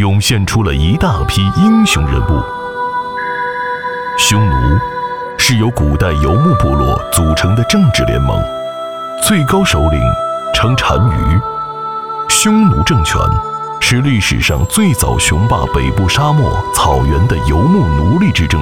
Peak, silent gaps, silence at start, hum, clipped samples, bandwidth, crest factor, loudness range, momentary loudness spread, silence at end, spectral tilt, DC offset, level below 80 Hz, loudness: 0 dBFS; none; 0 s; none; under 0.1%; 18.5 kHz; 12 dB; 2 LU; 8 LU; 0 s; -5 dB/octave; 0.8%; -22 dBFS; -12 LUFS